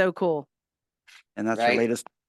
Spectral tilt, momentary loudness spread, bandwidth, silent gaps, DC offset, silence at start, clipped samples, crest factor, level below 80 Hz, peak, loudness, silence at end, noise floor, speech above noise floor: -5 dB/octave; 10 LU; 12.5 kHz; none; under 0.1%; 0 s; under 0.1%; 18 dB; -74 dBFS; -8 dBFS; -25 LUFS; 0.25 s; -89 dBFS; 63 dB